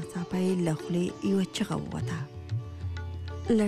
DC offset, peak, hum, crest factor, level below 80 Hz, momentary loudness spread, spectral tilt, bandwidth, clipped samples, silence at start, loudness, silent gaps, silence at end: under 0.1%; -16 dBFS; none; 14 dB; -50 dBFS; 9 LU; -6.5 dB/octave; 14 kHz; under 0.1%; 0 s; -31 LUFS; none; 0 s